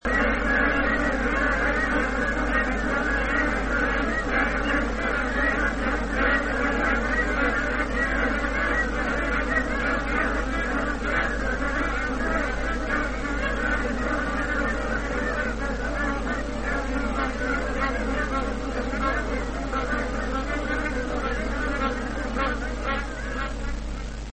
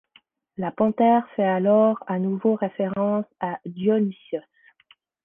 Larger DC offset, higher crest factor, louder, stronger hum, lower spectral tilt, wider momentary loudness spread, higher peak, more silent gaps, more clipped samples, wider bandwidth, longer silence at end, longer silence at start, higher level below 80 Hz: first, 0.4% vs under 0.1%; about the same, 16 dB vs 16 dB; about the same, -25 LUFS vs -23 LUFS; neither; second, -5.5 dB/octave vs -11 dB/octave; second, 6 LU vs 13 LU; about the same, -8 dBFS vs -8 dBFS; neither; neither; first, 8.8 kHz vs 3.6 kHz; second, 0 s vs 0.85 s; second, 0 s vs 0.6 s; first, -32 dBFS vs -68 dBFS